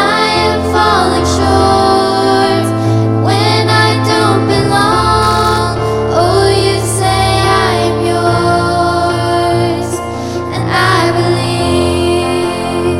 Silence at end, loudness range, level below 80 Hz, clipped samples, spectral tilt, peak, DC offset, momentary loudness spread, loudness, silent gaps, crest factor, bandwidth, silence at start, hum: 0 s; 2 LU; -30 dBFS; under 0.1%; -5 dB/octave; 0 dBFS; under 0.1%; 5 LU; -11 LUFS; none; 10 dB; 15.5 kHz; 0 s; none